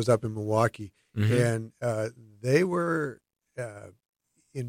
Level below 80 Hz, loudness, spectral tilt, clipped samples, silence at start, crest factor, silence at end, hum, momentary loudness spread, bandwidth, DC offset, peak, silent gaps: -64 dBFS; -28 LUFS; -6.5 dB/octave; under 0.1%; 0 s; 20 dB; 0 s; none; 16 LU; 16 kHz; under 0.1%; -10 dBFS; 4.09-4.13 s